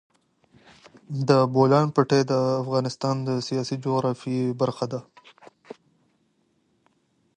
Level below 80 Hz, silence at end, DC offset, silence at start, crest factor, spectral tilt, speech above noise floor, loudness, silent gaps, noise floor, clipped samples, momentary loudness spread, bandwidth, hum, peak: -68 dBFS; 2.35 s; under 0.1%; 1.1 s; 20 dB; -7 dB/octave; 46 dB; -23 LUFS; none; -68 dBFS; under 0.1%; 12 LU; 10 kHz; none; -6 dBFS